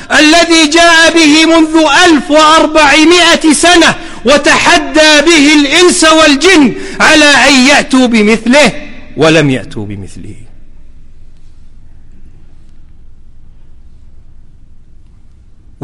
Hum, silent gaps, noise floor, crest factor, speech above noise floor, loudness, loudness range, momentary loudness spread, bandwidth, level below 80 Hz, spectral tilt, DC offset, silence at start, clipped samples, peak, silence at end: none; none; -35 dBFS; 8 dB; 29 dB; -5 LUFS; 9 LU; 8 LU; 14 kHz; -30 dBFS; -2.5 dB/octave; under 0.1%; 0 s; 0.7%; 0 dBFS; 1.1 s